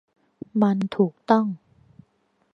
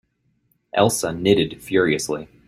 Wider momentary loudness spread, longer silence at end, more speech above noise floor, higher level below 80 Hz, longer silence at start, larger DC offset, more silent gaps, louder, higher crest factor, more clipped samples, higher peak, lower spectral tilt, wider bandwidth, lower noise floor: first, 15 LU vs 6 LU; first, 0.95 s vs 0.25 s; about the same, 46 dB vs 47 dB; second, -70 dBFS vs -54 dBFS; second, 0.55 s vs 0.75 s; neither; neither; second, -23 LUFS vs -20 LUFS; about the same, 22 dB vs 20 dB; neither; about the same, -2 dBFS vs -2 dBFS; first, -8.5 dB/octave vs -4.5 dB/octave; second, 6.4 kHz vs 15 kHz; about the same, -67 dBFS vs -66 dBFS